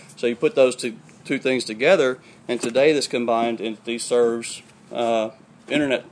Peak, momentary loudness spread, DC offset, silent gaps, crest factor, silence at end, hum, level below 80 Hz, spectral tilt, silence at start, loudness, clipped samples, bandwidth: -4 dBFS; 13 LU; under 0.1%; none; 18 dB; 0.05 s; none; -70 dBFS; -4 dB/octave; 0.1 s; -22 LUFS; under 0.1%; 11 kHz